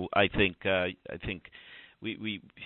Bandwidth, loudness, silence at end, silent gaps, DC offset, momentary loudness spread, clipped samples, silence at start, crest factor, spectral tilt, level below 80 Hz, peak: 4.3 kHz; -31 LUFS; 0 s; none; under 0.1%; 21 LU; under 0.1%; 0 s; 22 dB; -9 dB/octave; -50 dBFS; -10 dBFS